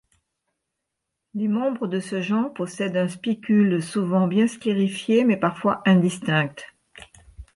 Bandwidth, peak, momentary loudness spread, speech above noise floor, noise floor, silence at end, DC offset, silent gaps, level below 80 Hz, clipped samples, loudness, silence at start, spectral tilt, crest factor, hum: 11.5 kHz; -8 dBFS; 9 LU; 60 dB; -81 dBFS; 0.15 s; under 0.1%; none; -58 dBFS; under 0.1%; -22 LUFS; 1.35 s; -6.5 dB/octave; 16 dB; none